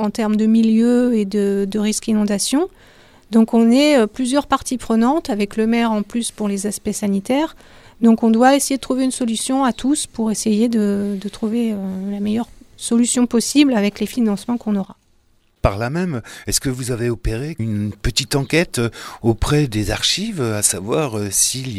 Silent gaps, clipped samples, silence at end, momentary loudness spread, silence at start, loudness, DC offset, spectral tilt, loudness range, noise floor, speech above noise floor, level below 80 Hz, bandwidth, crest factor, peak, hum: none; under 0.1%; 0 s; 9 LU; 0 s; -18 LUFS; under 0.1%; -4.5 dB/octave; 4 LU; -57 dBFS; 40 dB; -36 dBFS; 15.5 kHz; 18 dB; 0 dBFS; none